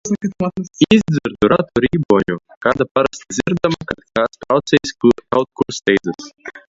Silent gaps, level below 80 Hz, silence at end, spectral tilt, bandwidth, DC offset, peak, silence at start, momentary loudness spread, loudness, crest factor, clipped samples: 2.05-2.09 s, 2.57-2.61 s, 2.91-2.95 s; -46 dBFS; 0.1 s; -5.5 dB/octave; 7.8 kHz; under 0.1%; 0 dBFS; 0.05 s; 8 LU; -17 LUFS; 16 dB; under 0.1%